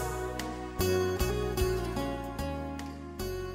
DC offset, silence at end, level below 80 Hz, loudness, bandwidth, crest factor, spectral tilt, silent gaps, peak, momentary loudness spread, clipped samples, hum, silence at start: under 0.1%; 0 s; -40 dBFS; -33 LUFS; 16 kHz; 16 dB; -5.5 dB/octave; none; -16 dBFS; 10 LU; under 0.1%; none; 0 s